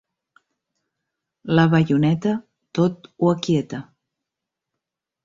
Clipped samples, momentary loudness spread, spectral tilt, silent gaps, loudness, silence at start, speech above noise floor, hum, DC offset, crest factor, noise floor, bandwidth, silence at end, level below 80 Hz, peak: under 0.1%; 14 LU; -7.5 dB/octave; none; -20 LUFS; 1.45 s; 65 dB; none; under 0.1%; 20 dB; -85 dBFS; 7.6 kHz; 1.4 s; -58 dBFS; -4 dBFS